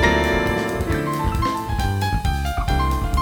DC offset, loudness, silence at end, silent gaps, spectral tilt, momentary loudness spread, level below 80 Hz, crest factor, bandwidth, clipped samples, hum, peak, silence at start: under 0.1%; -22 LUFS; 0 s; none; -5.5 dB/octave; 4 LU; -26 dBFS; 16 dB; over 20 kHz; under 0.1%; none; -4 dBFS; 0 s